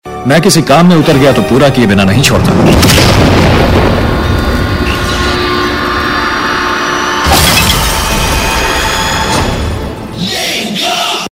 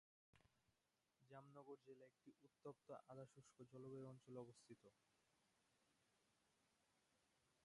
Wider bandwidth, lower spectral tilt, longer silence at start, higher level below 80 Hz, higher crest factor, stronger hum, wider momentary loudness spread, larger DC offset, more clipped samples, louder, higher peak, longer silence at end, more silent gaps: first, 17.5 kHz vs 11 kHz; second, -4.5 dB/octave vs -6.5 dB/octave; second, 0.05 s vs 0.35 s; first, -20 dBFS vs under -90 dBFS; second, 8 dB vs 22 dB; neither; about the same, 7 LU vs 9 LU; neither; first, 1% vs under 0.1%; first, -8 LUFS vs -63 LUFS; first, 0 dBFS vs -44 dBFS; about the same, 0.05 s vs 0 s; neither